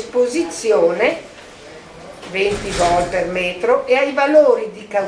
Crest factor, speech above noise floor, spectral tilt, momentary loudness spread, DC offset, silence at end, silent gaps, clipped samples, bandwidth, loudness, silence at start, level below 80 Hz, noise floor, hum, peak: 16 dB; 22 dB; -4 dB/octave; 24 LU; under 0.1%; 0 s; none; under 0.1%; 11 kHz; -16 LUFS; 0 s; -42 dBFS; -38 dBFS; none; -2 dBFS